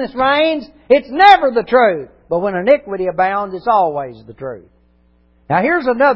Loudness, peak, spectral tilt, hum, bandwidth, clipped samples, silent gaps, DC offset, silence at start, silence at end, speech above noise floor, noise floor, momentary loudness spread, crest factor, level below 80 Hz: -14 LUFS; 0 dBFS; -6.5 dB/octave; none; 8 kHz; under 0.1%; none; under 0.1%; 0 s; 0 s; 39 dB; -54 dBFS; 16 LU; 14 dB; -50 dBFS